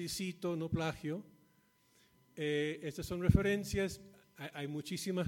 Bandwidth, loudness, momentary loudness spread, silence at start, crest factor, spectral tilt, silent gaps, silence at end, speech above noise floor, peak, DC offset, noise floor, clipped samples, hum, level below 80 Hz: 17 kHz; -37 LUFS; 14 LU; 0 s; 24 dB; -5.5 dB/octave; none; 0 s; 35 dB; -12 dBFS; under 0.1%; -71 dBFS; under 0.1%; none; -50 dBFS